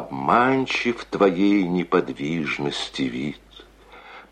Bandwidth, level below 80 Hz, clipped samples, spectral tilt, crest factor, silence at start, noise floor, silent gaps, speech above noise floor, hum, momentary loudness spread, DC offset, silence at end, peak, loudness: 9.8 kHz; -54 dBFS; under 0.1%; -5.5 dB/octave; 18 dB; 0 s; -47 dBFS; none; 25 dB; none; 11 LU; under 0.1%; 0.1 s; -4 dBFS; -22 LUFS